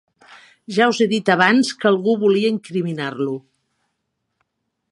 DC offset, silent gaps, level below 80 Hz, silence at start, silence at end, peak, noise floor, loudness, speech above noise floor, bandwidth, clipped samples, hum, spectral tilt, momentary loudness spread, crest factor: under 0.1%; none; -70 dBFS; 0.7 s; 1.5 s; 0 dBFS; -75 dBFS; -18 LUFS; 57 dB; 11.5 kHz; under 0.1%; none; -5 dB/octave; 10 LU; 20 dB